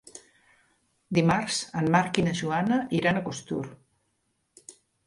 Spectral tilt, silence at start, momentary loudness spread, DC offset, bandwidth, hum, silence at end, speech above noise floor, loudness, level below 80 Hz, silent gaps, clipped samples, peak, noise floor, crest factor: -5 dB/octave; 0.15 s; 11 LU; under 0.1%; 11.5 kHz; none; 0.35 s; 49 dB; -26 LUFS; -60 dBFS; none; under 0.1%; -8 dBFS; -75 dBFS; 22 dB